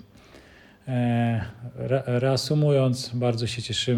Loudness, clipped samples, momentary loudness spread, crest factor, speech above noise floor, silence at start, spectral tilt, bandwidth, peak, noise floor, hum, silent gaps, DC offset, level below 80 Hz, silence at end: -25 LUFS; under 0.1%; 9 LU; 16 dB; 27 dB; 0.35 s; -6 dB/octave; 13 kHz; -8 dBFS; -51 dBFS; none; none; under 0.1%; -56 dBFS; 0 s